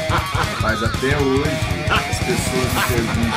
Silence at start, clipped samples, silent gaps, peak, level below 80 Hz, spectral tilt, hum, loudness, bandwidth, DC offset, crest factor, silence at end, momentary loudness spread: 0 s; under 0.1%; none; -4 dBFS; -30 dBFS; -4.5 dB/octave; none; -19 LUFS; 16 kHz; under 0.1%; 14 dB; 0 s; 2 LU